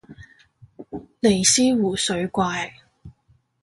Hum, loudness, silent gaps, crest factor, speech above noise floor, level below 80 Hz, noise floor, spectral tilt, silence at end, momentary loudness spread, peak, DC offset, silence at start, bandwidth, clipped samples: none; -20 LUFS; none; 20 dB; 42 dB; -52 dBFS; -62 dBFS; -3 dB/octave; 0.55 s; 22 LU; -4 dBFS; under 0.1%; 0.1 s; 11.5 kHz; under 0.1%